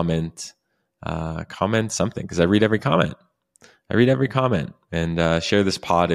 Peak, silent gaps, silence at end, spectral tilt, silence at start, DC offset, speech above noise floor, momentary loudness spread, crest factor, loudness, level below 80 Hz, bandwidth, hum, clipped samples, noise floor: -4 dBFS; none; 0 s; -5.5 dB/octave; 0 s; under 0.1%; 34 dB; 12 LU; 18 dB; -22 LUFS; -44 dBFS; 13.5 kHz; none; under 0.1%; -55 dBFS